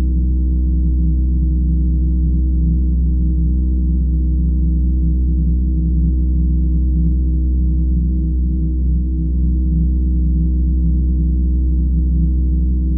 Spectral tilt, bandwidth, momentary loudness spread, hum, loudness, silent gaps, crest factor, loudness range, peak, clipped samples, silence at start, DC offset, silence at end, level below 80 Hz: -20 dB/octave; 0.7 kHz; 1 LU; none; -17 LUFS; none; 8 dB; 1 LU; -6 dBFS; under 0.1%; 0 s; under 0.1%; 0 s; -14 dBFS